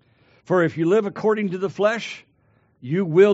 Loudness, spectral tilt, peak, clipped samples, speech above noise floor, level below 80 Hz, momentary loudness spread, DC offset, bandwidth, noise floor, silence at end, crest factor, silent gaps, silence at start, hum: -21 LUFS; -5.5 dB/octave; -4 dBFS; under 0.1%; 42 dB; -70 dBFS; 12 LU; under 0.1%; 8 kHz; -61 dBFS; 0 s; 18 dB; none; 0.5 s; none